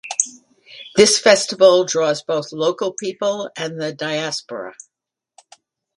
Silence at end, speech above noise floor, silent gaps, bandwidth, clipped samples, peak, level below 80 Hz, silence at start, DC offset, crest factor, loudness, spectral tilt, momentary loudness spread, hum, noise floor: 1.25 s; 65 dB; none; 11.5 kHz; under 0.1%; 0 dBFS; -64 dBFS; 0.05 s; under 0.1%; 20 dB; -18 LUFS; -2.5 dB/octave; 14 LU; none; -83 dBFS